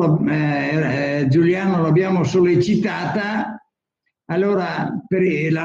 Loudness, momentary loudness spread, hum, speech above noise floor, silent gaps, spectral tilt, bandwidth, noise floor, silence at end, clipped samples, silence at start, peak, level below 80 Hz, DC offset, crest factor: -19 LUFS; 8 LU; none; 58 dB; none; -7.5 dB/octave; 7.6 kHz; -76 dBFS; 0 s; under 0.1%; 0 s; -6 dBFS; -54 dBFS; under 0.1%; 12 dB